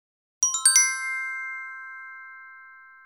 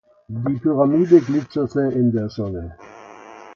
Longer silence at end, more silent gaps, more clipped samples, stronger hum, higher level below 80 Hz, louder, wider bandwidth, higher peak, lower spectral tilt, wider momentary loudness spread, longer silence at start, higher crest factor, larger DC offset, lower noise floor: first, 0.2 s vs 0 s; neither; neither; neither; second, -82 dBFS vs -48 dBFS; about the same, -21 LUFS vs -19 LUFS; first, over 20 kHz vs 7 kHz; about the same, -2 dBFS vs 0 dBFS; second, 7.5 dB/octave vs -9 dB/octave; first, 24 LU vs 15 LU; about the same, 0.4 s vs 0.3 s; first, 26 dB vs 18 dB; neither; first, -48 dBFS vs -41 dBFS